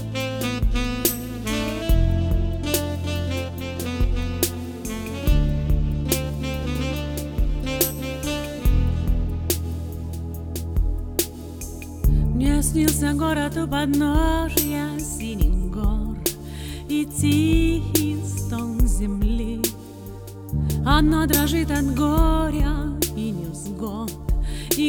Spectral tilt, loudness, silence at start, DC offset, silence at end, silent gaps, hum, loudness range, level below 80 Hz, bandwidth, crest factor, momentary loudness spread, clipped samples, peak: -5 dB/octave; -24 LUFS; 0 s; under 0.1%; 0 s; none; none; 4 LU; -26 dBFS; over 20 kHz; 18 dB; 10 LU; under 0.1%; -4 dBFS